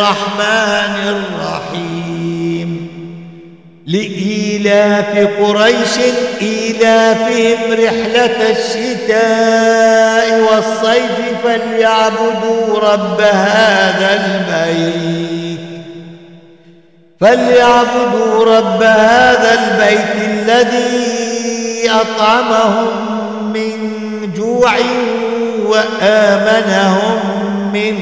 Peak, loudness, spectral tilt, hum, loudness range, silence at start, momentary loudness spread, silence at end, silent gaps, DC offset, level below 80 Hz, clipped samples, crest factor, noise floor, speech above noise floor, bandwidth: -2 dBFS; -12 LUFS; -4.5 dB/octave; none; 6 LU; 0 s; 10 LU; 0 s; none; 0.3%; -52 dBFS; under 0.1%; 10 dB; -45 dBFS; 34 dB; 8 kHz